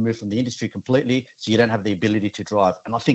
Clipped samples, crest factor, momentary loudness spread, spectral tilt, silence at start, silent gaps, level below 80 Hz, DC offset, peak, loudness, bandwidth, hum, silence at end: under 0.1%; 16 dB; 5 LU; -6 dB/octave; 0 s; none; -60 dBFS; under 0.1%; -2 dBFS; -20 LUFS; 8.4 kHz; none; 0 s